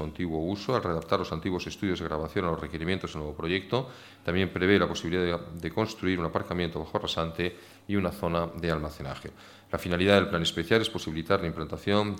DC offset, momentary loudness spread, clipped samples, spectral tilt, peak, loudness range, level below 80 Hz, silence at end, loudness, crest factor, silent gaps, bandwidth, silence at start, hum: under 0.1%; 10 LU; under 0.1%; -5.5 dB/octave; -6 dBFS; 3 LU; -50 dBFS; 0 s; -29 LUFS; 24 dB; none; 17 kHz; 0 s; none